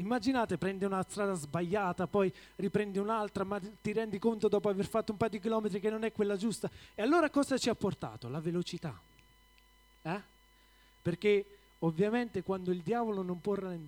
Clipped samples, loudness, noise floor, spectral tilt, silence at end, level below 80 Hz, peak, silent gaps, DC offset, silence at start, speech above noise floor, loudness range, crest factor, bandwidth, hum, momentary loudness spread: under 0.1%; -34 LUFS; -64 dBFS; -6 dB/octave; 0 s; -64 dBFS; -16 dBFS; none; under 0.1%; 0 s; 31 dB; 5 LU; 18 dB; 17 kHz; none; 10 LU